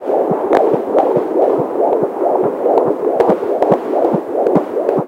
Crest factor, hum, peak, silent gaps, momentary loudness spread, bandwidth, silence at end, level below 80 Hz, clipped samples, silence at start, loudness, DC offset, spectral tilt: 14 dB; none; 0 dBFS; none; 2 LU; 15.5 kHz; 0 s; -58 dBFS; under 0.1%; 0 s; -15 LUFS; under 0.1%; -8.5 dB/octave